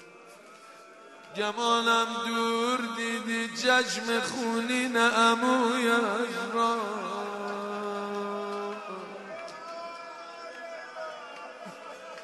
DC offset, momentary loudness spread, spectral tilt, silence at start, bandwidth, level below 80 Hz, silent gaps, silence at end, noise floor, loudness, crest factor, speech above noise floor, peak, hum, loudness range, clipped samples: under 0.1%; 18 LU; -2.5 dB/octave; 0 s; 12.5 kHz; -84 dBFS; none; 0 s; -51 dBFS; -27 LUFS; 18 dB; 24 dB; -12 dBFS; none; 13 LU; under 0.1%